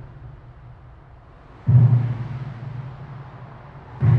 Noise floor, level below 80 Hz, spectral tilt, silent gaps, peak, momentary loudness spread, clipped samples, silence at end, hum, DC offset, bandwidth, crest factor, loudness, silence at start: -45 dBFS; -46 dBFS; -11 dB/octave; none; -4 dBFS; 27 LU; under 0.1%; 0 s; none; under 0.1%; 3.4 kHz; 18 dB; -21 LUFS; 0 s